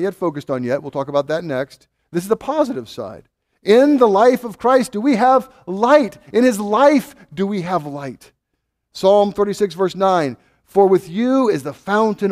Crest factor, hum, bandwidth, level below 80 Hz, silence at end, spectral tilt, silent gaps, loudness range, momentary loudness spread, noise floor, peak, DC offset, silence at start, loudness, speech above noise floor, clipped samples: 16 dB; none; 15.5 kHz; -58 dBFS; 0 s; -6 dB/octave; none; 5 LU; 14 LU; -74 dBFS; 0 dBFS; under 0.1%; 0 s; -17 LUFS; 57 dB; under 0.1%